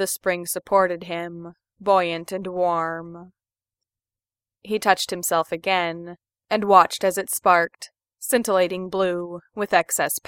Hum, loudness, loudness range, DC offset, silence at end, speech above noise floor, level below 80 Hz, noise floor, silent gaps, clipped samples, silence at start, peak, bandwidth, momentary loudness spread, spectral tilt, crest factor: none; -22 LUFS; 6 LU; under 0.1%; 0.1 s; over 68 dB; -66 dBFS; under -90 dBFS; none; under 0.1%; 0 s; 0 dBFS; 17 kHz; 16 LU; -3 dB/octave; 22 dB